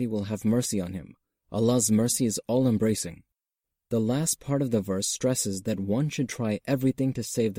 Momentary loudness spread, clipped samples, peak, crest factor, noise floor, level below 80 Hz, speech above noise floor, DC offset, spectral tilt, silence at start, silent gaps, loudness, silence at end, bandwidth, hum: 8 LU; under 0.1%; -12 dBFS; 14 dB; -88 dBFS; -60 dBFS; 62 dB; under 0.1%; -5 dB/octave; 0 s; none; -27 LUFS; 0 s; 16.5 kHz; none